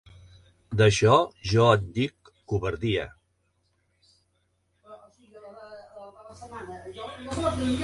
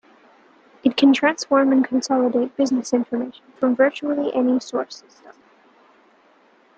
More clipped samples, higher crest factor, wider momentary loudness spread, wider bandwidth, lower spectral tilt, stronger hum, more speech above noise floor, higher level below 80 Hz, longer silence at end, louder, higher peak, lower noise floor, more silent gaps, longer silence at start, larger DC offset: neither; about the same, 22 dB vs 18 dB; first, 25 LU vs 12 LU; first, 11.5 kHz vs 8.6 kHz; first, -5.5 dB/octave vs -4 dB/octave; neither; first, 49 dB vs 36 dB; first, -48 dBFS vs -68 dBFS; second, 0 s vs 1.45 s; second, -24 LUFS vs -20 LUFS; about the same, -4 dBFS vs -4 dBFS; first, -72 dBFS vs -56 dBFS; neither; second, 0.7 s vs 0.85 s; neither